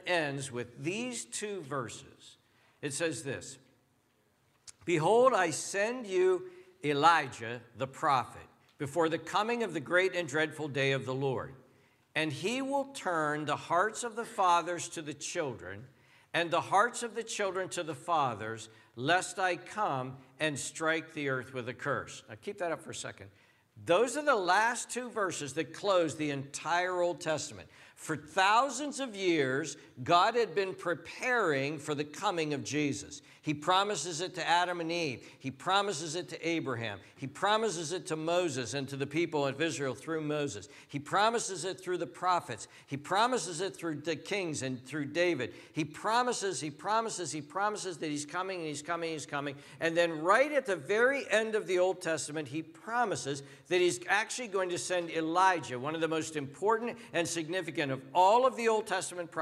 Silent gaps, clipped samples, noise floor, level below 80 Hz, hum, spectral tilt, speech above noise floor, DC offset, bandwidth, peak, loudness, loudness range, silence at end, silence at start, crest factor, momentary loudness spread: none; under 0.1%; -71 dBFS; -76 dBFS; none; -3.5 dB/octave; 39 dB; under 0.1%; 14 kHz; -12 dBFS; -32 LUFS; 4 LU; 0 s; 0 s; 22 dB; 12 LU